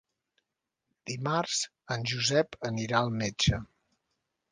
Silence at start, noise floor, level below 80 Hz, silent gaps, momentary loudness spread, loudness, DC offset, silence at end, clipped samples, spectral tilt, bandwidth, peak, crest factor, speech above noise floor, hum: 1.05 s; -86 dBFS; -52 dBFS; none; 9 LU; -30 LUFS; under 0.1%; 0.9 s; under 0.1%; -4 dB/octave; 10 kHz; -10 dBFS; 22 dB; 56 dB; none